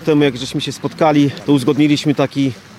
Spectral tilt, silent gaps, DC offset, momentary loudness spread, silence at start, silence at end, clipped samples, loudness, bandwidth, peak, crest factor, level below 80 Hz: -6 dB/octave; none; under 0.1%; 8 LU; 0 s; 0.2 s; under 0.1%; -15 LUFS; 13 kHz; -2 dBFS; 14 dB; -52 dBFS